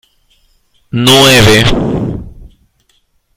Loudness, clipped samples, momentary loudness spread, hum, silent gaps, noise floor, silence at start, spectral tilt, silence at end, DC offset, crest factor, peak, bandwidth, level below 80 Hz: -7 LUFS; 0.4%; 16 LU; none; none; -56 dBFS; 0.95 s; -4 dB/octave; 0.9 s; under 0.1%; 12 dB; 0 dBFS; over 20 kHz; -28 dBFS